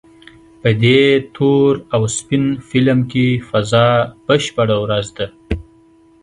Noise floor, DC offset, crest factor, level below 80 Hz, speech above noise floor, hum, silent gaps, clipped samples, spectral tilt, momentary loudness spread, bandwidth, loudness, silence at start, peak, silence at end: -49 dBFS; under 0.1%; 16 dB; -40 dBFS; 34 dB; none; none; under 0.1%; -5.5 dB/octave; 11 LU; 11 kHz; -15 LUFS; 0.65 s; 0 dBFS; 0.6 s